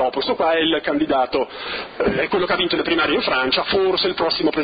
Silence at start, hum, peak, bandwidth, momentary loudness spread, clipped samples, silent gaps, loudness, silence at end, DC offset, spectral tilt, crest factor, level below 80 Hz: 0 s; none; -6 dBFS; 5.2 kHz; 5 LU; under 0.1%; none; -19 LUFS; 0 s; under 0.1%; -8 dB/octave; 14 dB; -48 dBFS